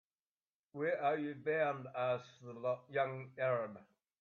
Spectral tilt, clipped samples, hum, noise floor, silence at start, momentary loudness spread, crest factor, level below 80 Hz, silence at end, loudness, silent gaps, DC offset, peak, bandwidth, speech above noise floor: -7.5 dB/octave; under 0.1%; none; under -90 dBFS; 0.75 s; 10 LU; 16 dB; -86 dBFS; 0.4 s; -38 LUFS; none; under 0.1%; -22 dBFS; 7 kHz; over 52 dB